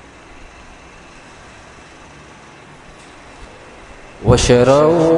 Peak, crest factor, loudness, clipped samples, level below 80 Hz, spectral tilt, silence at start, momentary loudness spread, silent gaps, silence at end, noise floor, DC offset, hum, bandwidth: 0 dBFS; 18 dB; -12 LUFS; under 0.1%; -34 dBFS; -5.5 dB/octave; 3.4 s; 29 LU; none; 0 s; -40 dBFS; under 0.1%; none; 11 kHz